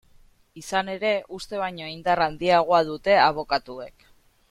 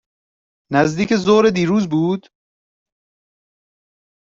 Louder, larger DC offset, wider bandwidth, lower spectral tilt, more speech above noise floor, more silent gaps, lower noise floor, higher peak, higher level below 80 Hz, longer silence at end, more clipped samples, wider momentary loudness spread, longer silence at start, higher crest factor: second, -23 LUFS vs -17 LUFS; neither; first, 14 kHz vs 7.8 kHz; second, -4.5 dB/octave vs -6 dB/octave; second, 32 dB vs over 74 dB; neither; second, -55 dBFS vs under -90 dBFS; second, -6 dBFS vs -2 dBFS; about the same, -54 dBFS vs -54 dBFS; second, 0.6 s vs 2.1 s; neither; first, 17 LU vs 7 LU; second, 0.55 s vs 0.7 s; about the same, 18 dB vs 18 dB